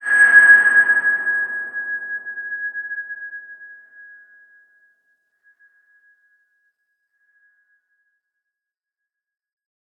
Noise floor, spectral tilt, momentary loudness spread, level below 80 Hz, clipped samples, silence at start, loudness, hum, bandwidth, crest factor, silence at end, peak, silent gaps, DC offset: -87 dBFS; -0.5 dB/octave; 23 LU; -88 dBFS; under 0.1%; 0 s; -15 LUFS; none; 9 kHz; 20 dB; 6.25 s; -2 dBFS; none; under 0.1%